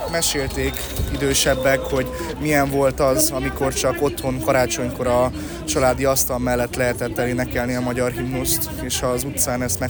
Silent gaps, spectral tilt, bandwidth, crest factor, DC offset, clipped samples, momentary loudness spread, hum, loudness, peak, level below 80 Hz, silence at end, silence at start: none; -4 dB/octave; over 20 kHz; 16 dB; under 0.1%; under 0.1%; 6 LU; none; -20 LUFS; -4 dBFS; -34 dBFS; 0 s; 0 s